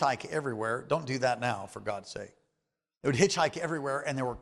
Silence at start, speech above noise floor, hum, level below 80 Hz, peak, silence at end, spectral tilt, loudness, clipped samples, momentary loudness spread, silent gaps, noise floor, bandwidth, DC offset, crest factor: 0 s; 54 dB; none; -62 dBFS; -10 dBFS; 0 s; -4.5 dB/octave; -31 LUFS; under 0.1%; 12 LU; none; -85 dBFS; 12.5 kHz; under 0.1%; 22 dB